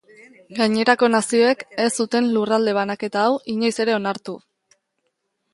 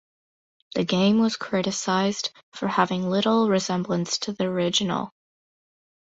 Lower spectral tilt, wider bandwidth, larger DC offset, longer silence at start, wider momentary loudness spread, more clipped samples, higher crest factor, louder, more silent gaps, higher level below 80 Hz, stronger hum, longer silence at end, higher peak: about the same, -4 dB/octave vs -4.5 dB/octave; first, 11.5 kHz vs 8.2 kHz; neither; second, 0.5 s vs 0.75 s; about the same, 10 LU vs 10 LU; neither; about the same, 20 dB vs 20 dB; first, -20 LUFS vs -24 LUFS; second, none vs 2.43-2.52 s; second, -70 dBFS vs -64 dBFS; neither; about the same, 1.15 s vs 1.05 s; first, 0 dBFS vs -4 dBFS